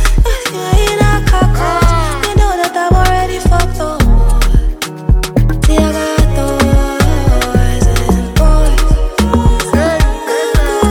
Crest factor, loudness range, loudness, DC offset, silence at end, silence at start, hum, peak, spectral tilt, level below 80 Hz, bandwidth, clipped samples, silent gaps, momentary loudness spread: 10 dB; 1 LU; -13 LUFS; under 0.1%; 0 s; 0 s; none; 0 dBFS; -5.5 dB/octave; -12 dBFS; 16 kHz; under 0.1%; none; 3 LU